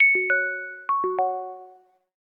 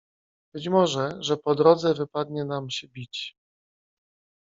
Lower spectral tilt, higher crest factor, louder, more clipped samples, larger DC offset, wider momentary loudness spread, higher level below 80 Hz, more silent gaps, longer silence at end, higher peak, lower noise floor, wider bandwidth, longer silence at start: first, -7 dB/octave vs -5.5 dB/octave; second, 16 dB vs 22 dB; about the same, -24 LUFS vs -25 LUFS; neither; neither; about the same, 16 LU vs 16 LU; second, -84 dBFS vs -68 dBFS; neither; second, 0.6 s vs 1.15 s; second, -10 dBFS vs -4 dBFS; second, -53 dBFS vs under -90 dBFS; second, 3.8 kHz vs 7.8 kHz; second, 0 s vs 0.55 s